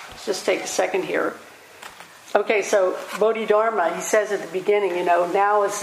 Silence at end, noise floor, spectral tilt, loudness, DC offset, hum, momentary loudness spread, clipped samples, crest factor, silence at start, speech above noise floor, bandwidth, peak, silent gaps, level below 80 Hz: 0 s; -42 dBFS; -3 dB/octave; -21 LUFS; under 0.1%; none; 17 LU; under 0.1%; 20 dB; 0 s; 21 dB; 15.5 kHz; -2 dBFS; none; -68 dBFS